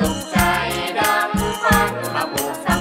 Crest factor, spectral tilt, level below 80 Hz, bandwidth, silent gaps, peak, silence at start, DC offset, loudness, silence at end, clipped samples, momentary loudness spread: 18 dB; -4 dB/octave; -34 dBFS; 16.5 kHz; none; 0 dBFS; 0 s; under 0.1%; -19 LUFS; 0 s; under 0.1%; 6 LU